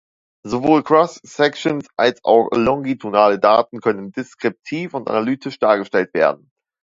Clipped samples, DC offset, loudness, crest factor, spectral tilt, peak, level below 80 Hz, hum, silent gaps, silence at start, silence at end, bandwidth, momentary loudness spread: under 0.1%; under 0.1%; -18 LUFS; 18 dB; -6 dB/octave; 0 dBFS; -56 dBFS; none; none; 0.45 s; 0.5 s; 7.8 kHz; 11 LU